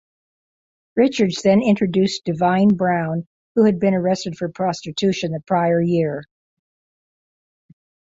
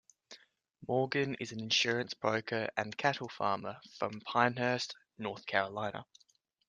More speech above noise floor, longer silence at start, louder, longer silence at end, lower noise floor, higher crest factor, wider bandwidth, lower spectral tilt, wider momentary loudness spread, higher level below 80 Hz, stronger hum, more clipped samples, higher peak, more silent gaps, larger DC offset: first, over 72 dB vs 27 dB; first, 0.95 s vs 0.3 s; first, -19 LUFS vs -34 LUFS; first, 1.9 s vs 0.65 s; first, under -90 dBFS vs -62 dBFS; second, 18 dB vs 24 dB; second, 7.8 kHz vs 10 kHz; first, -6.5 dB/octave vs -4 dB/octave; about the same, 9 LU vs 11 LU; first, -58 dBFS vs -76 dBFS; neither; neither; first, -2 dBFS vs -10 dBFS; first, 3.26-3.55 s vs none; neither